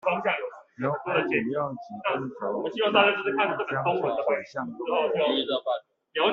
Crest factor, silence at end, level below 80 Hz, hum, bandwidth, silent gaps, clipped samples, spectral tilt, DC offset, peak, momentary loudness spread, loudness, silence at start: 22 dB; 0 s; -70 dBFS; none; 7 kHz; none; under 0.1%; -2 dB/octave; under 0.1%; -4 dBFS; 10 LU; -27 LUFS; 0.05 s